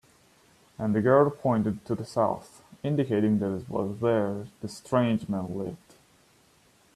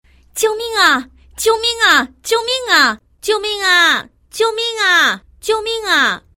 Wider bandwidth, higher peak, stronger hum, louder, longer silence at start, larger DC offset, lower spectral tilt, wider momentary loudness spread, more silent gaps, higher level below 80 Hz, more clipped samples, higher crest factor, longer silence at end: second, 13 kHz vs 16.5 kHz; second, -8 dBFS vs 0 dBFS; neither; second, -27 LUFS vs -14 LUFS; first, 0.8 s vs 0.35 s; neither; first, -8 dB/octave vs -0.5 dB/octave; first, 15 LU vs 8 LU; neither; second, -62 dBFS vs -50 dBFS; neither; about the same, 20 dB vs 16 dB; first, 1.2 s vs 0.2 s